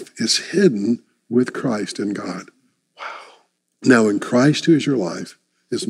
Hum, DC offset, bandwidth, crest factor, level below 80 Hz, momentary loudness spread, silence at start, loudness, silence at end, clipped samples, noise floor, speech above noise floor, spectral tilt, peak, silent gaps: none; under 0.1%; 13 kHz; 18 dB; -78 dBFS; 18 LU; 0 s; -19 LUFS; 0 s; under 0.1%; -57 dBFS; 40 dB; -5 dB/octave; -2 dBFS; none